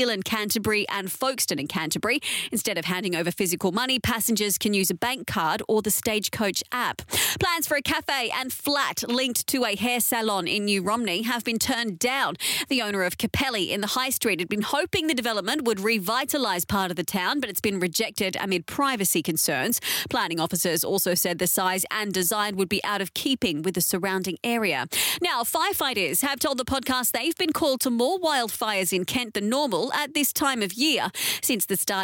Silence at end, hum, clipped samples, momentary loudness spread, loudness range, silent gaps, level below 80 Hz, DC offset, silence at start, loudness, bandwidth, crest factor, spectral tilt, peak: 0 s; none; under 0.1%; 3 LU; 1 LU; none; -56 dBFS; under 0.1%; 0 s; -24 LUFS; 17 kHz; 14 dB; -2.5 dB/octave; -12 dBFS